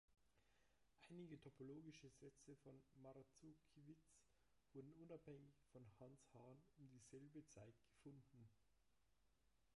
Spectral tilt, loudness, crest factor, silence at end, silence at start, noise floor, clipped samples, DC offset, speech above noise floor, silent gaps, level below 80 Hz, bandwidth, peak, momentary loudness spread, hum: -6 dB/octave; -65 LUFS; 18 dB; 0.05 s; 0.1 s; -86 dBFS; under 0.1%; under 0.1%; 21 dB; none; -86 dBFS; 11 kHz; -48 dBFS; 8 LU; none